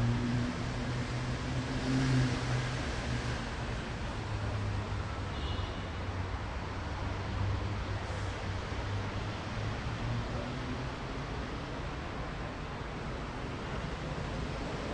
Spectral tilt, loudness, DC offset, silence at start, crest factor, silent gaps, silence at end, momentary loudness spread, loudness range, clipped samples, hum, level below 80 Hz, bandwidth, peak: -6 dB/octave; -36 LUFS; under 0.1%; 0 s; 16 dB; none; 0 s; 7 LU; 5 LU; under 0.1%; none; -42 dBFS; 10.5 kHz; -20 dBFS